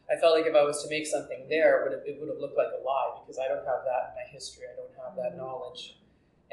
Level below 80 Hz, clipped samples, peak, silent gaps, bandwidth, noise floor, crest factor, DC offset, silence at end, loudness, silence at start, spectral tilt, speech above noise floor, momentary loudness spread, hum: -70 dBFS; under 0.1%; -10 dBFS; none; 12 kHz; -54 dBFS; 18 dB; under 0.1%; 0.6 s; -29 LUFS; 0.1 s; -3 dB/octave; 25 dB; 18 LU; none